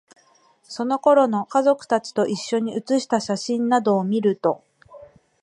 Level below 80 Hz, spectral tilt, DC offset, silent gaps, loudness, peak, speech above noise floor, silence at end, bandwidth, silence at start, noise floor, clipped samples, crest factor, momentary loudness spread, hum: -70 dBFS; -5.5 dB/octave; under 0.1%; none; -21 LUFS; -4 dBFS; 37 dB; 0.35 s; 11.5 kHz; 0.7 s; -58 dBFS; under 0.1%; 18 dB; 7 LU; none